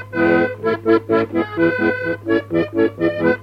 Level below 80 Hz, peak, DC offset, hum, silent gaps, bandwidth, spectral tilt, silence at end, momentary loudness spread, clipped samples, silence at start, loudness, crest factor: -52 dBFS; -2 dBFS; under 0.1%; none; none; 5.4 kHz; -8 dB/octave; 0 s; 4 LU; under 0.1%; 0 s; -18 LUFS; 14 dB